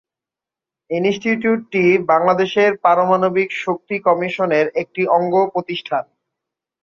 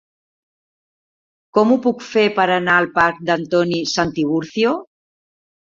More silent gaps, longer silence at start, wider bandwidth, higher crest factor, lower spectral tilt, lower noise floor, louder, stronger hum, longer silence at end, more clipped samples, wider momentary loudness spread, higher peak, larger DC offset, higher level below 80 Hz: neither; second, 0.9 s vs 1.55 s; about the same, 7.2 kHz vs 7.6 kHz; about the same, 16 dB vs 18 dB; first, -6.5 dB/octave vs -5 dB/octave; about the same, -88 dBFS vs under -90 dBFS; about the same, -17 LUFS vs -17 LUFS; neither; about the same, 0.8 s vs 0.9 s; neither; about the same, 8 LU vs 6 LU; about the same, -2 dBFS vs -2 dBFS; neither; second, -64 dBFS vs -56 dBFS